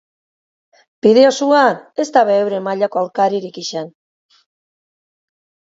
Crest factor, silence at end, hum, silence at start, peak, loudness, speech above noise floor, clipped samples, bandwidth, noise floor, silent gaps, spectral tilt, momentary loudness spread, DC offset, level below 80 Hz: 18 dB; 1.9 s; none; 1.05 s; 0 dBFS; -15 LUFS; over 76 dB; under 0.1%; 7.8 kHz; under -90 dBFS; none; -4.5 dB/octave; 14 LU; under 0.1%; -68 dBFS